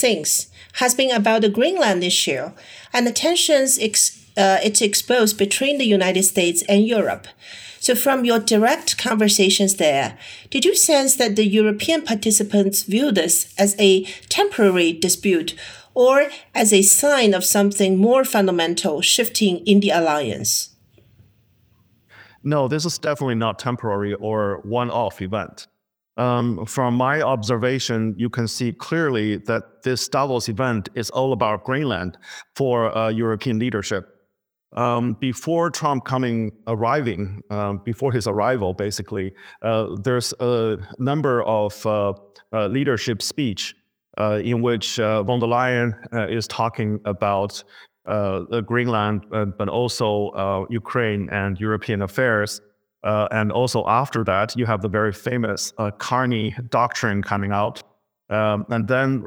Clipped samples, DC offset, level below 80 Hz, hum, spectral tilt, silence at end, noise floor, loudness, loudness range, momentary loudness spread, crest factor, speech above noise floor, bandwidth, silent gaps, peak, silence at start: under 0.1%; under 0.1%; -60 dBFS; none; -3.5 dB/octave; 0 s; -73 dBFS; -19 LUFS; 7 LU; 10 LU; 20 dB; 53 dB; over 20 kHz; none; 0 dBFS; 0 s